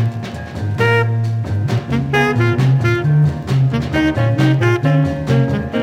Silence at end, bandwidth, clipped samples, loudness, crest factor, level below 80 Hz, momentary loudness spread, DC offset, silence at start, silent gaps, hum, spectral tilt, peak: 0 s; 10.5 kHz; under 0.1%; -16 LUFS; 14 dB; -40 dBFS; 5 LU; under 0.1%; 0 s; none; none; -7.5 dB/octave; -2 dBFS